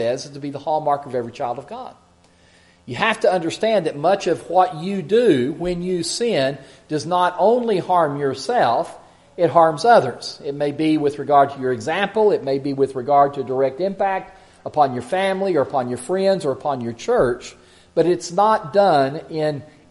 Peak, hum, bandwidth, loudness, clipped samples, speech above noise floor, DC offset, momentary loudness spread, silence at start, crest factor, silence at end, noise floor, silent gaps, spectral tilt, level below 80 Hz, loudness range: 0 dBFS; none; 11.5 kHz; -19 LUFS; under 0.1%; 34 dB; under 0.1%; 11 LU; 0 s; 20 dB; 0.25 s; -53 dBFS; none; -5.5 dB/octave; -56 dBFS; 3 LU